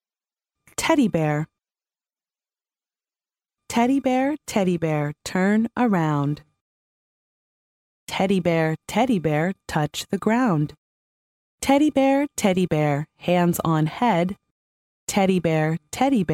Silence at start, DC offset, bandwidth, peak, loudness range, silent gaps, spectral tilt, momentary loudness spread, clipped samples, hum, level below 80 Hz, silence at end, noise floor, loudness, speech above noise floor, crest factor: 0.8 s; under 0.1%; 16.5 kHz; -6 dBFS; 5 LU; 6.61-8.07 s, 10.78-11.58 s, 14.51-15.07 s; -6 dB/octave; 7 LU; under 0.1%; none; -56 dBFS; 0 s; under -90 dBFS; -22 LUFS; over 69 dB; 16 dB